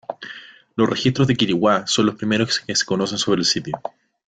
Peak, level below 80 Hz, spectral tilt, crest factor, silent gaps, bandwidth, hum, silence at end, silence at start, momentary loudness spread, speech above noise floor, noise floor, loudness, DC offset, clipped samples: -4 dBFS; -56 dBFS; -4 dB/octave; 18 dB; none; 9.4 kHz; none; 0.4 s; 0.1 s; 15 LU; 21 dB; -40 dBFS; -19 LUFS; under 0.1%; under 0.1%